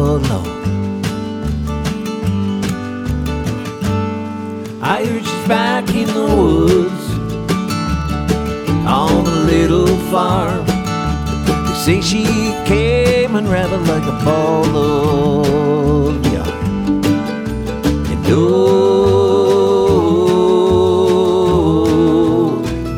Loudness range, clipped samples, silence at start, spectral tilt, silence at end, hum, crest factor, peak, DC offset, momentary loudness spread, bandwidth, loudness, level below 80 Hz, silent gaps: 7 LU; under 0.1%; 0 s; -6.5 dB/octave; 0 s; none; 14 dB; 0 dBFS; under 0.1%; 9 LU; 18 kHz; -15 LUFS; -28 dBFS; none